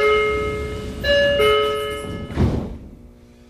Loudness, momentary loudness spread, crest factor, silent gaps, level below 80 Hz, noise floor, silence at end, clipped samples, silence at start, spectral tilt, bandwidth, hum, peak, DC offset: -20 LUFS; 13 LU; 14 dB; none; -34 dBFS; -45 dBFS; 0.45 s; under 0.1%; 0 s; -5.5 dB/octave; 15 kHz; none; -6 dBFS; under 0.1%